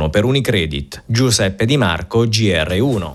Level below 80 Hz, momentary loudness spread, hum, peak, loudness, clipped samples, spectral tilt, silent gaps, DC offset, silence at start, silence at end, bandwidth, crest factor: -34 dBFS; 4 LU; none; -2 dBFS; -16 LUFS; under 0.1%; -5 dB/octave; none; under 0.1%; 0 s; 0 s; 13.5 kHz; 14 dB